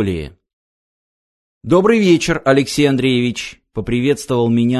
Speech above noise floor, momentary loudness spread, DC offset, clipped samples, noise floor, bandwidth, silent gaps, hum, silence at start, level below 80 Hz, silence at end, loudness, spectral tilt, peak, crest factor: over 75 dB; 14 LU; under 0.1%; under 0.1%; under -90 dBFS; 12.5 kHz; 0.53-1.61 s; none; 0 s; -40 dBFS; 0 s; -15 LUFS; -5.5 dB/octave; 0 dBFS; 16 dB